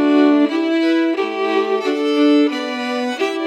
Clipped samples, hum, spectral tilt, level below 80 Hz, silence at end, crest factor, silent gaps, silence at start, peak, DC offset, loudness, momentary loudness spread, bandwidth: under 0.1%; none; -4 dB/octave; -88 dBFS; 0 s; 12 dB; none; 0 s; -4 dBFS; under 0.1%; -17 LUFS; 8 LU; 9.2 kHz